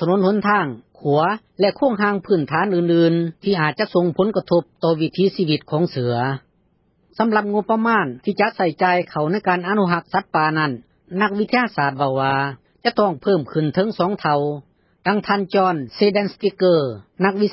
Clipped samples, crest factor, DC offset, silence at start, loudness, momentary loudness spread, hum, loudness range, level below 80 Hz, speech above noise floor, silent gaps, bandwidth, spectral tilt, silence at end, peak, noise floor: under 0.1%; 16 dB; under 0.1%; 0 s; -19 LUFS; 5 LU; none; 2 LU; -60 dBFS; 43 dB; none; 5.8 kHz; -11 dB/octave; 0 s; -4 dBFS; -62 dBFS